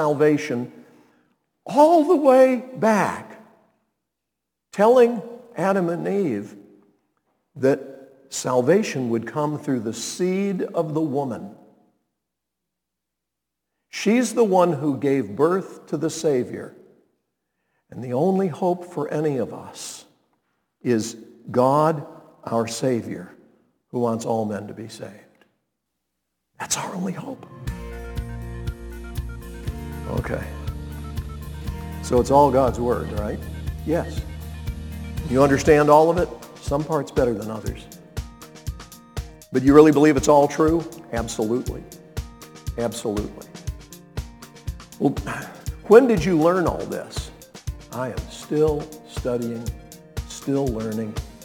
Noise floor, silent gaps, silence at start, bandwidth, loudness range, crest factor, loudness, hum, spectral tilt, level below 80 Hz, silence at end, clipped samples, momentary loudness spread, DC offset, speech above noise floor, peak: -83 dBFS; none; 0 s; 18.5 kHz; 12 LU; 22 dB; -21 LUFS; none; -6 dB/octave; -40 dBFS; 0 s; under 0.1%; 20 LU; under 0.1%; 63 dB; 0 dBFS